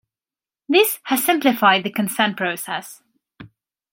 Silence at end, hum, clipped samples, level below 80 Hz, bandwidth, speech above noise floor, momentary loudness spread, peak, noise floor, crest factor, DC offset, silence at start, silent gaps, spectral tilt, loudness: 0.45 s; none; under 0.1%; -70 dBFS; 17 kHz; over 71 dB; 12 LU; -2 dBFS; under -90 dBFS; 20 dB; under 0.1%; 0.7 s; none; -3 dB/octave; -19 LUFS